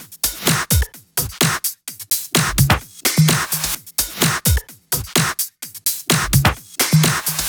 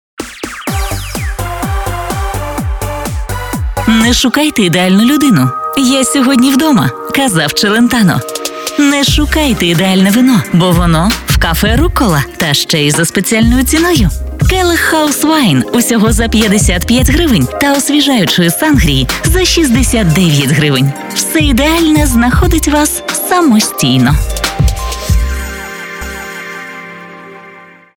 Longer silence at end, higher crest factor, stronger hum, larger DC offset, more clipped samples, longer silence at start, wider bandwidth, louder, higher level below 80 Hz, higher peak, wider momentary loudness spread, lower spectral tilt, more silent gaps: second, 0 s vs 0.3 s; first, 18 dB vs 10 dB; neither; neither; neither; second, 0 s vs 0.2 s; about the same, over 20 kHz vs 19.5 kHz; second, -18 LUFS vs -10 LUFS; second, -30 dBFS vs -20 dBFS; about the same, 0 dBFS vs 0 dBFS; about the same, 8 LU vs 10 LU; second, -3 dB/octave vs -4.5 dB/octave; neither